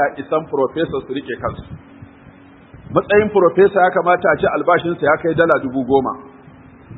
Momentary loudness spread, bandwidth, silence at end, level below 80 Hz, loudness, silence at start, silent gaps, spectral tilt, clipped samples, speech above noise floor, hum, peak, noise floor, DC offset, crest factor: 13 LU; 4.1 kHz; 0 s; -48 dBFS; -16 LUFS; 0 s; none; -9.5 dB/octave; under 0.1%; 27 dB; none; 0 dBFS; -43 dBFS; under 0.1%; 18 dB